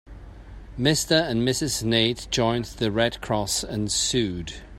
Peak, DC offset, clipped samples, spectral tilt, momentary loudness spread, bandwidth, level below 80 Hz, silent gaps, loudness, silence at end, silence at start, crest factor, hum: -6 dBFS; under 0.1%; under 0.1%; -3.5 dB/octave; 6 LU; 16 kHz; -44 dBFS; none; -23 LUFS; 0 s; 0.05 s; 20 dB; none